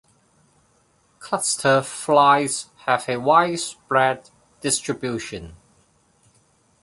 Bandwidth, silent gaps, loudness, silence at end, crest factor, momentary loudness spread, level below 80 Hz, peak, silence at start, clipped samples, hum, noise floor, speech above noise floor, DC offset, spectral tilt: 11.5 kHz; none; -20 LUFS; 1.3 s; 20 dB; 13 LU; -58 dBFS; -2 dBFS; 1.2 s; under 0.1%; none; -62 dBFS; 41 dB; under 0.1%; -3 dB/octave